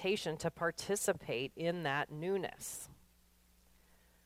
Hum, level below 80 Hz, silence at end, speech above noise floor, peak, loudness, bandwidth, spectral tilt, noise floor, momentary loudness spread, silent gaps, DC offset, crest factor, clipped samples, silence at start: none; -68 dBFS; 1.3 s; 31 dB; -22 dBFS; -38 LUFS; 16 kHz; -4 dB/octave; -68 dBFS; 9 LU; none; under 0.1%; 18 dB; under 0.1%; 0 s